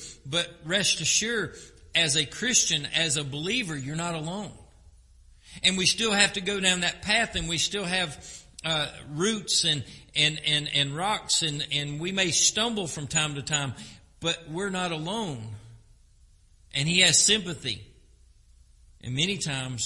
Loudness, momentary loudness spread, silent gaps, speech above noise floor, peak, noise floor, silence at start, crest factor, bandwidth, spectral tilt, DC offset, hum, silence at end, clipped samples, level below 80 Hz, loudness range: -25 LUFS; 12 LU; none; 30 dB; -4 dBFS; -57 dBFS; 0 s; 24 dB; 11.5 kHz; -2 dB/octave; under 0.1%; none; 0 s; under 0.1%; -54 dBFS; 4 LU